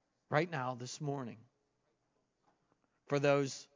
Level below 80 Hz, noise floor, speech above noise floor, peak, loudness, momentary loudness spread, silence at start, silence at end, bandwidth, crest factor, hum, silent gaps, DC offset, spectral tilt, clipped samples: -86 dBFS; -81 dBFS; 45 dB; -14 dBFS; -36 LUFS; 11 LU; 0.3 s; 0.1 s; 7.6 kHz; 24 dB; none; none; under 0.1%; -5.5 dB/octave; under 0.1%